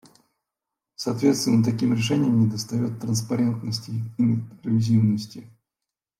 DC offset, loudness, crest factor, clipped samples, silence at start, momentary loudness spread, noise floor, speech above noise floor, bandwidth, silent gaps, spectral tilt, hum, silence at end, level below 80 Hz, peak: under 0.1%; -23 LUFS; 16 dB; under 0.1%; 1 s; 9 LU; -87 dBFS; 65 dB; 14.5 kHz; none; -6 dB/octave; none; 0.75 s; -64 dBFS; -8 dBFS